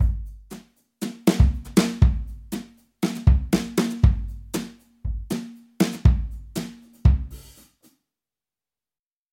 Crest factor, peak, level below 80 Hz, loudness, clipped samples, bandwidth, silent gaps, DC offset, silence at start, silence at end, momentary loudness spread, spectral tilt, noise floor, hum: 20 dB; -4 dBFS; -26 dBFS; -24 LUFS; under 0.1%; 16.5 kHz; none; under 0.1%; 0 s; 1.9 s; 19 LU; -6.5 dB/octave; under -90 dBFS; none